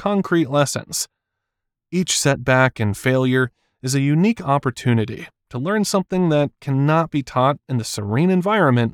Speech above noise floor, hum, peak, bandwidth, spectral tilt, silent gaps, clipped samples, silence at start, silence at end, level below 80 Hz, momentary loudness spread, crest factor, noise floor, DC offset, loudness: 62 dB; none; -2 dBFS; 16.5 kHz; -5.5 dB/octave; none; under 0.1%; 0 s; 0.05 s; -54 dBFS; 9 LU; 16 dB; -80 dBFS; under 0.1%; -19 LUFS